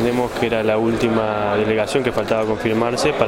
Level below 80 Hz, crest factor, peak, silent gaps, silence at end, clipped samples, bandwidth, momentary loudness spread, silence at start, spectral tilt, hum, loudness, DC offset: -42 dBFS; 18 dB; -2 dBFS; none; 0 s; under 0.1%; 16.5 kHz; 2 LU; 0 s; -5.5 dB/octave; none; -19 LUFS; under 0.1%